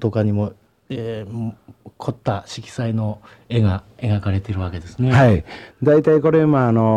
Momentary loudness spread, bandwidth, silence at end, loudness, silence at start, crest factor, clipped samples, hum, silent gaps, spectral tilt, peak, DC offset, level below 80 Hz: 15 LU; 9.2 kHz; 0 s; -19 LUFS; 0 s; 18 dB; under 0.1%; none; none; -8.5 dB/octave; 0 dBFS; under 0.1%; -44 dBFS